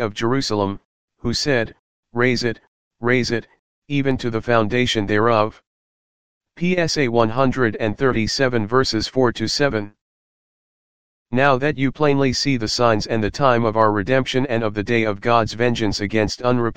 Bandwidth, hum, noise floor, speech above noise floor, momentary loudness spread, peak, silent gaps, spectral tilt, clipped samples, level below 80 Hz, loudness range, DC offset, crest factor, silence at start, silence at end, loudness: 15.5 kHz; none; under -90 dBFS; over 71 dB; 8 LU; 0 dBFS; 0.85-1.08 s, 1.79-2.03 s, 2.67-2.91 s, 3.59-3.82 s, 5.67-6.41 s, 10.01-11.26 s; -5 dB/octave; under 0.1%; -44 dBFS; 3 LU; 2%; 20 dB; 0 s; 0 s; -19 LUFS